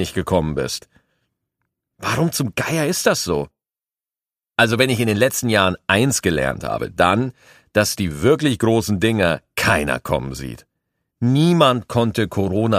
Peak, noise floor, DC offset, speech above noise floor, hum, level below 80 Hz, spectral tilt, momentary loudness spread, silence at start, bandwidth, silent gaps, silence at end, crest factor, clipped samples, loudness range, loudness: 0 dBFS; under -90 dBFS; under 0.1%; over 72 dB; none; -44 dBFS; -5 dB/octave; 9 LU; 0 s; 15.5 kHz; none; 0 s; 20 dB; under 0.1%; 4 LU; -19 LUFS